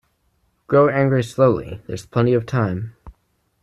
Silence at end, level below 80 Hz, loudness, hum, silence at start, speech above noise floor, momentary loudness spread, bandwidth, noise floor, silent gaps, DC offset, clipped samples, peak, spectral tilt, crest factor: 0.55 s; -50 dBFS; -19 LUFS; none; 0.7 s; 47 dB; 14 LU; 12.5 kHz; -66 dBFS; none; under 0.1%; under 0.1%; -4 dBFS; -8 dB/octave; 16 dB